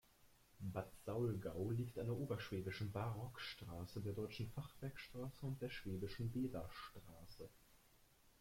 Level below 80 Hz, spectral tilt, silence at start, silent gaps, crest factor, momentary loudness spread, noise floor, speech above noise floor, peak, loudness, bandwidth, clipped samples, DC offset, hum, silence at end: -66 dBFS; -7 dB/octave; 0.2 s; none; 18 dB; 11 LU; -71 dBFS; 25 dB; -30 dBFS; -48 LUFS; 16.5 kHz; under 0.1%; under 0.1%; none; 0.1 s